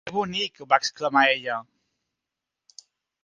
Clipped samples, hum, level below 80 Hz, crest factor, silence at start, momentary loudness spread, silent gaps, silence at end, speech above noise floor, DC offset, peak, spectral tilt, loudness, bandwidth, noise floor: under 0.1%; none; -70 dBFS; 24 dB; 0.05 s; 10 LU; none; 1.6 s; 62 dB; under 0.1%; -4 dBFS; -3 dB/octave; -23 LUFS; 9.8 kHz; -86 dBFS